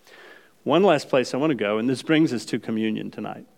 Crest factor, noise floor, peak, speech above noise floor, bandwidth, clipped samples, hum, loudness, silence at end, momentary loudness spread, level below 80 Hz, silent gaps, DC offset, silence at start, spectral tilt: 18 dB; -49 dBFS; -4 dBFS; 27 dB; 14.5 kHz; under 0.1%; none; -22 LUFS; 0.15 s; 12 LU; -76 dBFS; none; under 0.1%; 0.2 s; -5.5 dB/octave